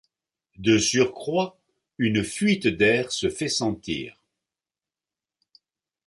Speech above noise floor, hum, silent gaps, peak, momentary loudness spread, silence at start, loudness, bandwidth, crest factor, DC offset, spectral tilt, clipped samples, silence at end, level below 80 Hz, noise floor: over 67 dB; none; none; -6 dBFS; 11 LU; 0.6 s; -24 LUFS; 11.5 kHz; 20 dB; under 0.1%; -4 dB/octave; under 0.1%; 2 s; -54 dBFS; under -90 dBFS